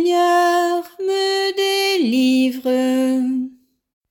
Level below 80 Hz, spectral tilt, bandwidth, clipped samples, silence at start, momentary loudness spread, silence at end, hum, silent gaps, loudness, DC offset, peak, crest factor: -72 dBFS; -3 dB/octave; 17 kHz; under 0.1%; 0 s; 7 LU; 0.6 s; none; none; -18 LUFS; under 0.1%; -8 dBFS; 10 dB